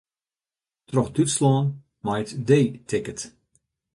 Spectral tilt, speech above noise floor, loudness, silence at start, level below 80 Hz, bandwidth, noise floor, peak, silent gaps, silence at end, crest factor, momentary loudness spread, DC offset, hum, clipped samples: -6 dB/octave; over 68 dB; -24 LUFS; 0.9 s; -58 dBFS; 11.5 kHz; under -90 dBFS; -6 dBFS; none; 0.65 s; 18 dB; 13 LU; under 0.1%; none; under 0.1%